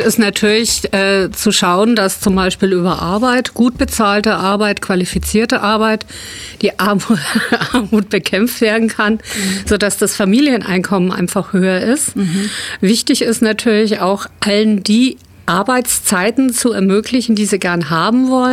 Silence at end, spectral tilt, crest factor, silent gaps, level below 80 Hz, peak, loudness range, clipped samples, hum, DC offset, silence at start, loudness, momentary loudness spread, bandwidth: 0 s; -4 dB/octave; 12 dB; none; -38 dBFS; -2 dBFS; 2 LU; under 0.1%; none; under 0.1%; 0 s; -14 LUFS; 5 LU; 16 kHz